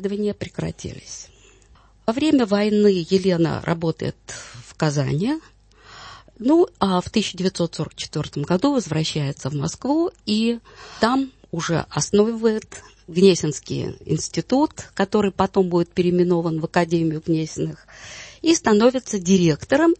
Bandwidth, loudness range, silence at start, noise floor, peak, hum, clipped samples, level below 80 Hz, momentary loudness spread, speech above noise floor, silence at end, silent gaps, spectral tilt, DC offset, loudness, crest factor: 8.8 kHz; 3 LU; 0 s; -52 dBFS; -2 dBFS; none; under 0.1%; -50 dBFS; 16 LU; 32 dB; 0.05 s; none; -5.5 dB/octave; under 0.1%; -21 LUFS; 18 dB